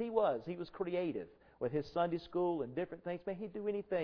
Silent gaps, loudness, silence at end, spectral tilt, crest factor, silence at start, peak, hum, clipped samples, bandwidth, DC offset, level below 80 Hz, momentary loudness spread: none; -39 LUFS; 0 s; -6 dB/octave; 18 dB; 0 s; -20 dBFS; none; under 0.1%; 5.4 kHz; under 0.1%; -68 dBFS; 7 LU